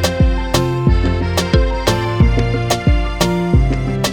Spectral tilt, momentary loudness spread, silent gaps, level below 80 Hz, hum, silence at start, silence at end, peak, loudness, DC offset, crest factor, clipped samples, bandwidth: -5.5 dB/octave; 3 LU; none; -18 dBFS; none; 0 s; 0 s; 0 dBFS; -16 LUFS; under 0.1%; 14 dB; under 0.1%; 19.5 kHz